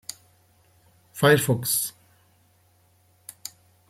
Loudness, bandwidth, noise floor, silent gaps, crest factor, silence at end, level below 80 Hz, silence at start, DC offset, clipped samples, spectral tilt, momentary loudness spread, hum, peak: -22 LUFS; 16.5 kHz; -62 dBFS; none; 24 dB; 0.6 s; -64 dBFS; 1.15 s; under 0.1%; under 0.1%; -4 dB/octave; 25 LU; none; -4 dBFS